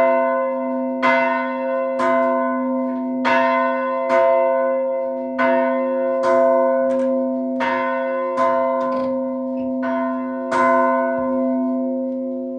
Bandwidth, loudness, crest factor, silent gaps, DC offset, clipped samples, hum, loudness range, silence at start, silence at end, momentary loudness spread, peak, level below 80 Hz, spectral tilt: 9.2 kHz; -19 LUFS; 16 dB; none; under 0.1%; under 0.1%; none; 2 LU; 0 s; 0 s; 7 LU; -2 dBFS; -64 dBFS; -5.5 dB/octave